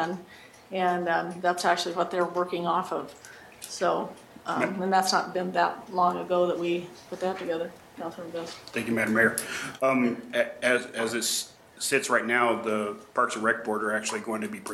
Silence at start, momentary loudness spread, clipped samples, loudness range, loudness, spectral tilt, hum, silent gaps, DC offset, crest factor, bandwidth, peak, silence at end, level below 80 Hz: 0 s; 13 LU; under 0.1%; 3 LU; -27 LUFS; -3.5 dB/octave; none; none; under 0.1%; 20 dB; 16.5 kHz; -8 dBFS; 0 s; -70 dBFS